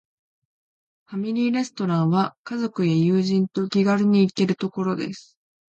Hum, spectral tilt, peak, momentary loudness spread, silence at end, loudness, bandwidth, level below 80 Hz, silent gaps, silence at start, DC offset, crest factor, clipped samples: none; -7 dB/octave; -8 dBFS; 10 LU; 0.55 s; -22 LUFS; 8.2 kHz; -68 dBFS; 2.37-2.44 s; 1.1 s; under 0.1%; 14 dB; under 0.1%